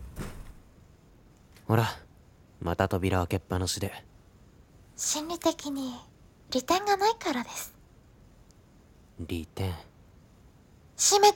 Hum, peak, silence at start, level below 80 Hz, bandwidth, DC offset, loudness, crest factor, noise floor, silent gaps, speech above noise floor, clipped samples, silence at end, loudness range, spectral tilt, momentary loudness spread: none; -6 dBFS; 0 s; -52 dBFS; 17.5 kHz; under 0.1%; -29 LUFS; 24 dB; -57 dBFS; none; 29 dB; under 0.1%; 0 s; 8 LU; -3.5 dB/octave; 19 LU